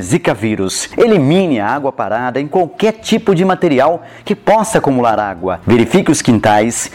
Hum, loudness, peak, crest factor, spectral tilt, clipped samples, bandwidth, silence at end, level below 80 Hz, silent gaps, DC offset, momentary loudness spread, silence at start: none; -13 LUFS; -2 dBFS; 10 dB; -5 dB/octave; under 0.1%; 16.5 kHz; 0.05 s; -44 dBFS; none; under 0.1%; 7 LU; 0 s